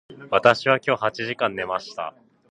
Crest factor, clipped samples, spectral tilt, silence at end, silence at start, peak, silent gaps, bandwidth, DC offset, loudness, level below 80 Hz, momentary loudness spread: 22 dB; under 0.1%; -5 dB/octave; 0.4 s; 0.1 s; 0 dBFS; none; 9.8 kHz; under 0.1%; -22 LUFS; -64 dBFS; 15 LU